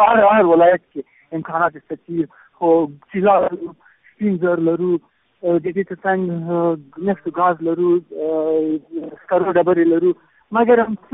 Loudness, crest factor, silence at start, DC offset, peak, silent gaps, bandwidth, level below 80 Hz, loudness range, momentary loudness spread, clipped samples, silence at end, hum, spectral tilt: -18 LUFS; 16 dB; 0 s; under 0.1%; -2 dBFS; none; 3.9 kHz; -60 dBFS; 3 LU; 14 LU; under 0.1%; 0.15 s; none; -2.5 dB/octave